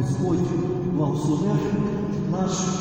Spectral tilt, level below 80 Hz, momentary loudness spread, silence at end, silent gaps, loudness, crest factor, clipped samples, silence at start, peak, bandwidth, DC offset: -6.5 dB/octave; -46 dBFS; 3 LU; 0 s; none; -24 LUFS; 12 dB; under 0.1%; 0 s; -10 dBFS; 16 kHz; under 0.1%